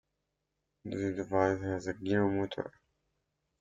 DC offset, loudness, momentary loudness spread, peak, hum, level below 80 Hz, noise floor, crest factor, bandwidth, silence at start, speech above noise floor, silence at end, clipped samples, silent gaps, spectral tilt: under 0.1%; -33 LUFS; 12 LU; -14 dBFS; none; -66 dBFS; -84 dBFS; 20 dB; 7.6 kHz; 0.85 s; 52 dB; 0.9 s; under 0.1%; none; -7 dB/octave